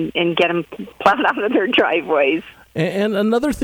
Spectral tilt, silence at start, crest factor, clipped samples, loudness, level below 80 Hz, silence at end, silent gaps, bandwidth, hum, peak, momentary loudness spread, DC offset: -5.5 dB/octave; 0 s; 18 dB; under 0.1%; -18 LUFS; -48 dBFS; 0 s; none; 19.5 kHz; none; 0 dBFS; 8 LU; under 0.1%